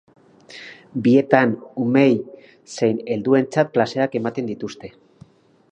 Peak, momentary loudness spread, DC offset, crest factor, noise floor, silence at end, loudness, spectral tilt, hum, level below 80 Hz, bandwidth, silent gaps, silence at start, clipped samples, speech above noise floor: 0 dBFS; 22 LU; under 0.1%; 20 dB; -50 dBFS; 0.85 s; -19 LUFS; -7 dB/octave; none; -64 dBFS; 8.8 kHz; none; 0.5 s; under 0.1%; 31 dB